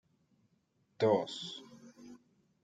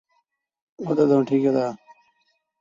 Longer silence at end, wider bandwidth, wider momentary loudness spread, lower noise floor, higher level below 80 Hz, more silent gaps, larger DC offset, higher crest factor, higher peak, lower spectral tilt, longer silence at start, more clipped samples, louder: second, 0.5 s vs 0.85 s; first, 9.2 kHz vs 7.4 kHz; first, 25 LU vs 16 LU; first, -76 dBFS vs -71 dBFS; second, -82 dBFS vs -68 dBFS; neither; neither; about the same, 22 dB vs 18 dB; second, -18 dBFS vs -6 dBFS; second, -5.5 dB/octave vs -8.5 dB/octave; first, 1 s vs 0.8 s; neither; second, -34 LUFS vs -21 LUFS